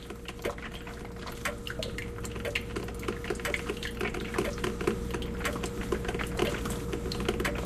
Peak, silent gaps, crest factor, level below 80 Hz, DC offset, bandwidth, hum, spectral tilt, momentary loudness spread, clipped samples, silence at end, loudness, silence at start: -12 dBFS; none; 22 dB; -42 dBFS; under 0.1%; 14 kHz; none; -4.5 dB/octave; 7 LU; under 0.1%; 0 s; -34 LUFS; 0 s